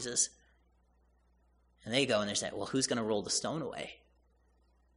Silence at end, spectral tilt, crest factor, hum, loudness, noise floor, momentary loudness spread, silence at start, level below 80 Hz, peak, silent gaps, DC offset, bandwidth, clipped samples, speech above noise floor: 1 s; -2.5 dB/octave; 24 dB; none; -33 LUFS; -69 dBFS; 12 LU; 0 s; -68 dBFS; -14 dBFS; none; under 0.1%; 10.5 kHz; under 0.1%; 36 dB